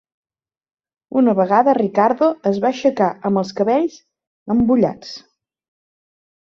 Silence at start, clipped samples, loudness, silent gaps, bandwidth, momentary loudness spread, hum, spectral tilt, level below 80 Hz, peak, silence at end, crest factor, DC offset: 1.1 s; under 0.1%; -17 LUFS; 4.27-4.46 s; 7.2 kHz; 9 LU; none; -7 dB/octave; -52 dBFS; -2 dBFS; 1.3 s; 18 dB; under 0.1%